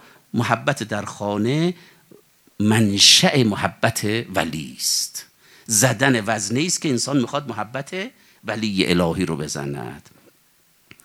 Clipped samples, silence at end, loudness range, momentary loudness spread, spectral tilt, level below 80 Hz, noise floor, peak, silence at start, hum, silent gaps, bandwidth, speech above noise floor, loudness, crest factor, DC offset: under 0.1%; 1.05 s; 7 LU; 15 LU; -3.5 dB/octave; -58 dBFS; -58 dBFS; 0 dBFS; 0.35 s; none; none; 17.5 kHz; 38 dB; -19 LUFS; 22 dB; under 0.1%